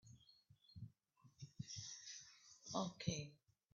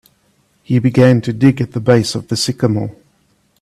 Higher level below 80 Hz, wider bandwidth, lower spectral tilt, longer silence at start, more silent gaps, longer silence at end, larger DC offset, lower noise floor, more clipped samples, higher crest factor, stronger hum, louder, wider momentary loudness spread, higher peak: second, -78 dBFS vs -50 dBFS; second, 7.4 kHz vs 14 kHz; second, -5 dB/octave vs -6.5 dB/octave; second, 0.05 s vs 0.7 s; neither; second, 0.35 s vs 0.7 s; neither; first, -74 dBFS vs -58 dBFS; neither; first, 24 dB vs 14 dB; neither; second, -50 LUFS vs -14 LUFS; first, 19 LU vs 8 LU; second, -28 dBFS vs 0 dBFS